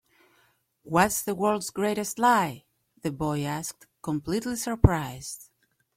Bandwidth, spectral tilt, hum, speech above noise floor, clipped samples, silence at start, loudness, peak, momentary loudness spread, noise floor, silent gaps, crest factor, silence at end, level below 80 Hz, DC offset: 16.5 kHz; -5 dB/octave; none; 41 dB; under 0.1%; 0.85 s; -27 LUFS; -2 dBFS; 15 LU; -67 dBFS; none; 26 dB; 0.55 s; -42 dBFS; under 0.1%